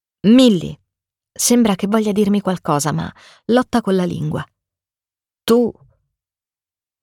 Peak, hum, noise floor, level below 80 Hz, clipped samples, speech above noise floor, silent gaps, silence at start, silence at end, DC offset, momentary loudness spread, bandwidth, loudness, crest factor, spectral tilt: -2 dBFS; none; under -90 dBFS; -52 dBFS; under 0.1%; over 74 dB; none; 0.25 s; 1.3 s; under 0.1%; 16 LU; 17.5 kHz; -16 LUFS; 16 dB; -5 dB/octave